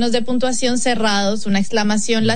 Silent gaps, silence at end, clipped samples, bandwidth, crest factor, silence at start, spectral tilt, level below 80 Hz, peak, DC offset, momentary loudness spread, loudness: none; 0 s; under 0.1%; 10.5 kHz; 14 dB; 0 s; -4 dB/octave; -50 dBFS; -4 dBFS; 9%; 2 LU; -18 LUFS